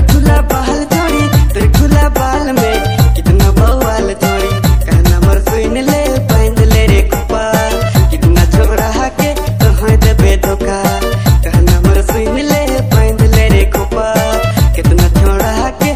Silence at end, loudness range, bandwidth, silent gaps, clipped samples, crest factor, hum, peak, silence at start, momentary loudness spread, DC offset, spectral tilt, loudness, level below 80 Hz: 0 s; 1 LU; 16 kHz; none; 0.2%; 8 dB; none; 0 dBFS; 0 s; 5 LU; 0.9%; -6 dB/octave; -11 LUFS; -12 dBFS